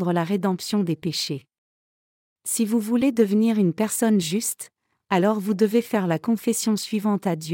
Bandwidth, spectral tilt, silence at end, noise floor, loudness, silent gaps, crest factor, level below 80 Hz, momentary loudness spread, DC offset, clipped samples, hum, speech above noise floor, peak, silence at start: 17 kHz; -5 dB/octave; 0 s; under -90 dBFS; -23 LUFS; 1.58-2.36 s; 16 dB; -68 dBFS; 7 LU; under 0.1%; under 0.1%; none; over 68 dB; -8 dBFS; 0 s